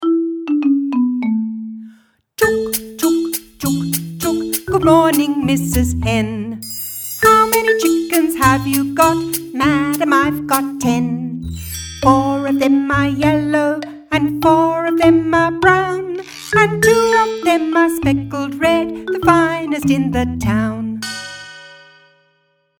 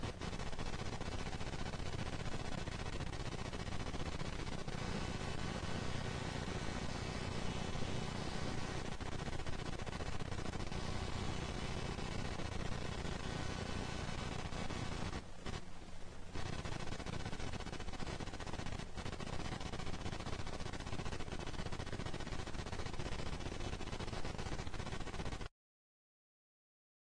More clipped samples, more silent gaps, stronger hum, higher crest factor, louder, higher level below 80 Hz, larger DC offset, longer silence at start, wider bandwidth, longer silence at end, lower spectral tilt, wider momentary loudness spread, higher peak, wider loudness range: neither; neither; neither; about the same, 16 dB vs 16 dB; first, -16 LUFS vs -44 LUFS; first, -38 dBFS vs -48 dBFS; neither; about the same, 0 s vs 0 s; first, over 20 kHz vs 10.5 kHz; second, 1.05 s vs 1.65 s; about the same, -5 dB/octave vs -5 dB/octave; first, 12 LU vs 3 LU; first, 0 dBFS vs -26 dBFS; about the same, 4 LU vs 3 LU